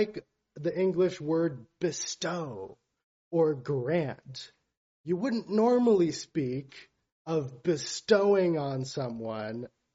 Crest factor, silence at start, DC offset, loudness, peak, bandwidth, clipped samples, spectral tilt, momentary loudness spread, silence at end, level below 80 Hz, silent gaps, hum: 20 dB; 0 s; under 0.1%; -29 LUFS; -10 dBFS; 8 kHz; under 0.1%; -5.5 dB/octave; 18 LU; 0.25 s; -70 dBFS; 3.04-3.31 s, 4.77-5.04 s, 7.12-7.25 s; none